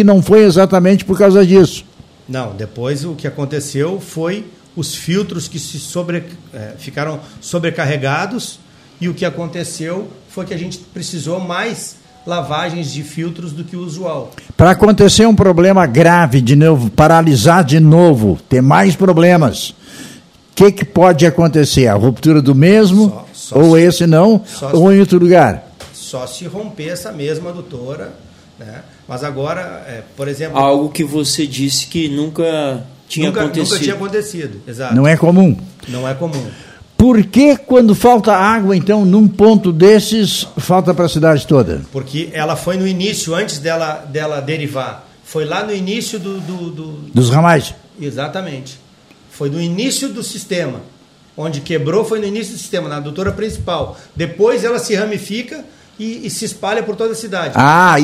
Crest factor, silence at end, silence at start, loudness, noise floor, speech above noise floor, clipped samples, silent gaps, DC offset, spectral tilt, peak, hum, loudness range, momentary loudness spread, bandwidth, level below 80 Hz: 12 dB; 0 s; 0 s; -12 LUFS; -44 dBFS; 32 dB; 0.3%; none; under 0.1%; -6 dB/octave; 0 dBFS; none; 12 LU; 18 LU; 15.5 kHz; -40 dBFS